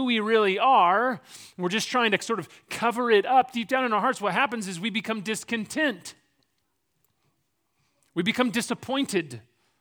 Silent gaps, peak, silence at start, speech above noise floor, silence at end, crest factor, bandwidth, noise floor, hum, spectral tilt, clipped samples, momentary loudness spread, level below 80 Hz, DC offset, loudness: none; -6 dBFS; 0 s; 51 dB; 0.4 s; 20 dB; over 20 kHz; -76 dBFS; none; -4 dB/octave; under 0.1%; 13 LU; -74 dBFS; under 0.1%; -25 LUFS